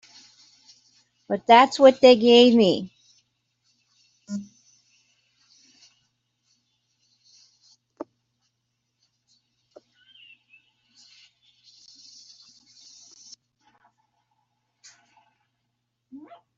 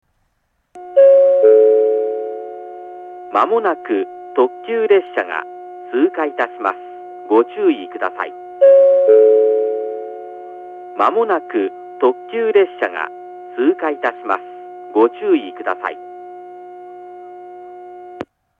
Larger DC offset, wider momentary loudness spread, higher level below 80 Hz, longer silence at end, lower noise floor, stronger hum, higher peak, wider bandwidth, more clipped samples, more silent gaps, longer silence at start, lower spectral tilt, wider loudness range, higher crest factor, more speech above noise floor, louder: neither; first, 29 LU vs 24 LU; about the same, -72 dBFS vs -72 dBFS; first, 12.15 s vs 0.35 s; first, -78 dBFS vs -66 dBFS; neither; about the same, -2 dBFS vs 0 dBFS; first, 7.8 kHz vs 4 kHz; neither; neither; first, 1.3 s vs 0.75 s; second, -4.5 dB/octave vs -6 dB/octave; first, 26 LU vs 7 LU; first, 22 dB vs 16 dB; first, 62 dB vs 50 dB; about the same, -17 LUFS vs -15 LUFS